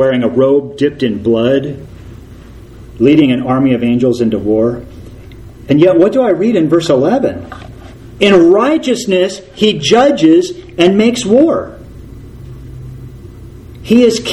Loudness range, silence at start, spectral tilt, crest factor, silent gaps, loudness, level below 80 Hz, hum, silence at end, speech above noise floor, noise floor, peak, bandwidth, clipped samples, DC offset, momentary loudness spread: 4 LU; 0 s; -6 dB/octave; 12 dB; none; -11 LUFS; -38 dBFS; none; 0 s; 23 dB; -33 dBFS; 0 dBFS; 12.5 kHz; 0.2%; under 0.1%; 22 LU